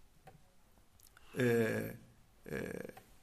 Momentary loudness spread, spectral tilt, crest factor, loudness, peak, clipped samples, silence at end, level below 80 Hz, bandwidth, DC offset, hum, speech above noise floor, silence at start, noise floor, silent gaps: 20 LU; -6.5 dB/octave; 18 dB; -37 LUFS; -22 dBFS; under 0.1%; 0.05 s; -66 dBFS; 15 kHz; under 0.1%; none; 29 dB; 0.25 s; -65 dBFS; none